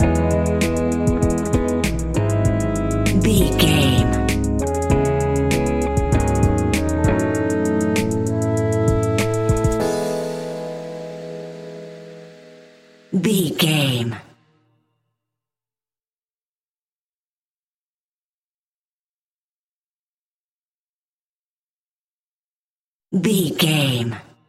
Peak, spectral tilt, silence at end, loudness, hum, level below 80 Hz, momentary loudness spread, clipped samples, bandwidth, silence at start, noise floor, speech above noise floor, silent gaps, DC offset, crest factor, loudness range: -2 dBFS; -5.5 dB/octave; 0.3 s; -19 LUFS; none; -30 dBFS; 13 LU; under 0.1%; 16 kHz; 0 s; under -90 dBFS; over 71 dB; 16.13-16.22 s, 16.31-16.36 s, 16.43-23.00 s; under 0.1%; 18 dB; 9 LU